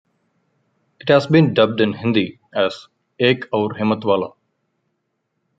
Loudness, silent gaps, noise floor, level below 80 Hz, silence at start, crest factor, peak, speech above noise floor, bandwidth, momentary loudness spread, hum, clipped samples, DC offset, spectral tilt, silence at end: -18 LUFS; none; -73 dBFS; -62 dBFS; 1.05 s; 18 dB; -2 dBFS; 55 dB; 7.8 kHz; 10 LU; none; under 0.1%; under 0.1%; -7.5 dB/octave; 1.3 s